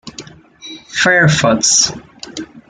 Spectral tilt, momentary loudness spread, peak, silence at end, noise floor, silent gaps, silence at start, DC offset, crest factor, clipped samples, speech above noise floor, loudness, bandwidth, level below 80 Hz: -2.5 dB/octave; 22 LU; 0 dBFS; 0.1 s; -36 dBFS; none; 0.05 s; under 0.1%; 16 dB; under 0.1%; 24 dB; -11 LUFS; 10.5 kHz; -48 dBFS